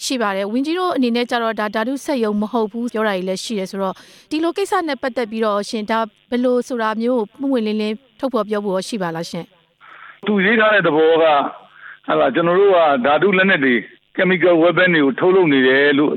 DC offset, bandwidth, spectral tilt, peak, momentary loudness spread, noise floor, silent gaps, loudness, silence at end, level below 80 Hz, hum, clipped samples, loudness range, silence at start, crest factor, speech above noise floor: under 0.1%; 15.5 kHz; -5 dB/octave; -4 dBFS; 11 LU; -43 dBFS; none; -17 LUFS; 0 s; -64 dBFS; none; under 0.1%; 7 LU; 0 s; 14 dB; 26 dB